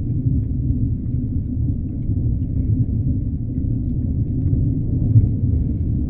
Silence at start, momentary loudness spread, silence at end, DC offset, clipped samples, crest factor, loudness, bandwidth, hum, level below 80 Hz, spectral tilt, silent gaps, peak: 0 s; 7 LU; 0 s; under 0.1%; under 0.1%; 18 dB; -21 LUFS; 0.9 kHz; none; -26 dBFS; -15.5 dB/octave; none; -2 dBFS